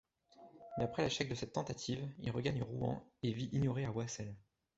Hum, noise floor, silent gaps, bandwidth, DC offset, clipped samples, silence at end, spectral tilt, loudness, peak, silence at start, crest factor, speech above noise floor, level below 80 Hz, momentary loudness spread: none; -63 dBFS; none; 8 kHz; under 0.1%; under 0.1%; 0.35 s; -5.5 dB/octave; -40 LUFS; -20 dBFS; 0.4 s; 20 dB; 24 dB; -62 dBFS; 10 LU